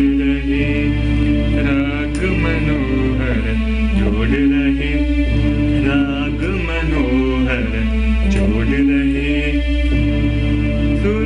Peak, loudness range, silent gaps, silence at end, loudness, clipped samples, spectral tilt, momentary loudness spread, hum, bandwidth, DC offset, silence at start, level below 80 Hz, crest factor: -6 dBFS; 1 LU; none; 0 s; -17 LUFS; under 0.1%; -7.5 dB/octave; 3 LU; none; 10 kHz; under 0.1%; 0 s; -20 dBFS; 10 dB